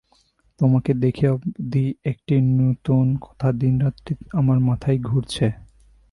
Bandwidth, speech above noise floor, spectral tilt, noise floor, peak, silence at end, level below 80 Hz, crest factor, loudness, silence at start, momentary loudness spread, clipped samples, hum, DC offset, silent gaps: 11.5 kHz; 41 dB; -8.5 dB/octave; -61 dBFS; -6 dBFS; 0.5 s; -46 dBFS; 14 dB; -21 LUFS; 0.6 s; 6 LU; under 0.1%; none; under 0.1%; none